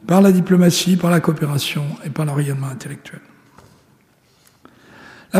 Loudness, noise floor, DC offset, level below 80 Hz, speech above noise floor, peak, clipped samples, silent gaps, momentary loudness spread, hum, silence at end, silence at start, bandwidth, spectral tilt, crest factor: -17 LUFS; -56 dBFS; under 0.1%; -60 dBFS; 39 dB; -2 dBFS; under 0.1%; none; 19 LU; none; 0 s; 0.05 s; 15.5 kHz; -6 dB/octave; 16 dB